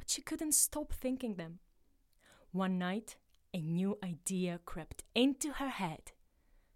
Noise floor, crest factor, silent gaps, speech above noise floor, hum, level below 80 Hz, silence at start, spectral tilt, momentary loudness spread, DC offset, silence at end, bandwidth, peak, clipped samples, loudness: -70 dBFS; 22 dB; none; 34 dB; none; -56 dBFS; 0 s; -3.5 dB/octave; 15 LU; under 0.1%; 0.65 s; 16.5 kHz; -16 dBFS; under 0.1%; -36 LUFS